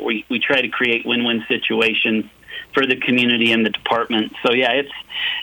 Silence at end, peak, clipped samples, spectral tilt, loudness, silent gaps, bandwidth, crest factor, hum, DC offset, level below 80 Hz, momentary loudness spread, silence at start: 0 s; -4 dBFS; under 0.1%; -5 dB/octave; -18 LUFS; none; 19.5 kHz; 16 dB; none; under 0.1%; -60 dBFS; 8 LU; 0 s